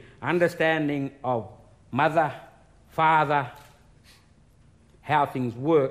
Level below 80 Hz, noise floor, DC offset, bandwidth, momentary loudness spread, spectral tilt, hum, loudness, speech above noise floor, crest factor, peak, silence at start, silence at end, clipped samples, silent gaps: -60 dBFS; -57 dBFS; under 0.1%; 15.5 kHz; 14 LU; -7 dB/octave; none; -25 LUFS; 33 dB; 16 dB; -10 dBFS; 0.2 s; 0 s; under 0.1%; none